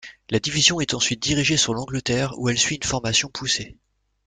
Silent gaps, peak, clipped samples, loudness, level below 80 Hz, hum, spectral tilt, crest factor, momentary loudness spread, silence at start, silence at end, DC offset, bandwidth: none; -2 dBFS; under 0.1%; -21 LUFS; -48 dBFS; none; -2.5 dB/octave; 20 dB; 7 LU; 0.05 s; 0.55 s; under 0.1%; 10 kHz